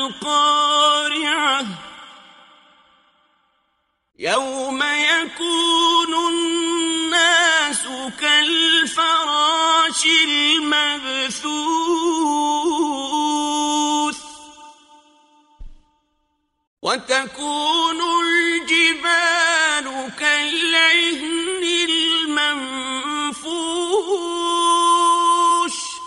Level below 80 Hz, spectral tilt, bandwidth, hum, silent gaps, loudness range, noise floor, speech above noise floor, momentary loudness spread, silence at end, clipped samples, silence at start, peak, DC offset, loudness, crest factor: -56 dBFS; -0.5 dB/octave; 11.5 kHz; none; 16.67-16.77 s; 10 LU; -69 dBFS; 51 dB; 9 LU; 0 s; under 0.1%; 0 s; -2 dBFS; under 0.1%; -17 LUFS; 18 dB